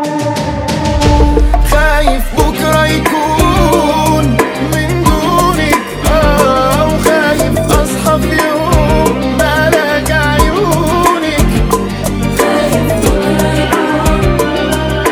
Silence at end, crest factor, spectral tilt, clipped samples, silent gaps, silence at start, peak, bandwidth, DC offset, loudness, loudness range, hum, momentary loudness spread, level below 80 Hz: 0 s; 10 dB; -5 dB/octave; 0.5%; none; 0 s; 0 dBFS; over 20 kHz; under 0.1%; -11 LUFS; 1 LU; none; 4 LU; -18 dBFS